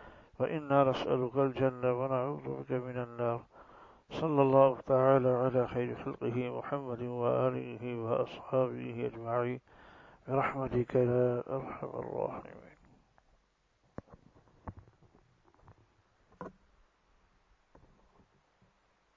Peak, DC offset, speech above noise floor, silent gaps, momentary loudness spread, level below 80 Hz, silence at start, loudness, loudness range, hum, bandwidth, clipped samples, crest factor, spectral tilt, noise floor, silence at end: -10 dBFS; under 0.1%; 41 dB; none; 23 LU; -64 dBFS; 0 s; -32 LUFS; 8 LU; none; 7.2 kHz; under 0.1%; 24 dB; -9 dB/octave; -73 dBFS; 2.65 s